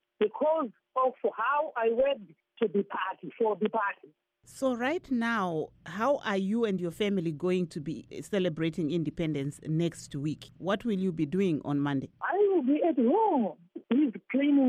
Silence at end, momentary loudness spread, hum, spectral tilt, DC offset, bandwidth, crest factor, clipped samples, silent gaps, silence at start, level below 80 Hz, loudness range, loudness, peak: 0 s; 9 LU; none; -7 dB/octave; under 0.1%; 13 kHz; 14 dB; under 0.1%; none; 0.2 s; -64 dBFS; 4 LU; -30 LUFS; -16 dBFS